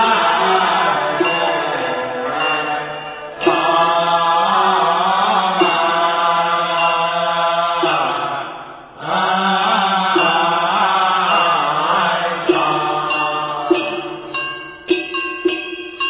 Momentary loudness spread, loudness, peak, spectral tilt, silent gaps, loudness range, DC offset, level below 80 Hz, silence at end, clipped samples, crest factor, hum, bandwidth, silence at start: 9 LU; -16 LUFS; -2 dBFS; -8 dB/octave; none; 3 LU; under 0.1%; -56 dBFS; 0 s; under 0.1%; 16 dB; none; 4 kHz; 0 s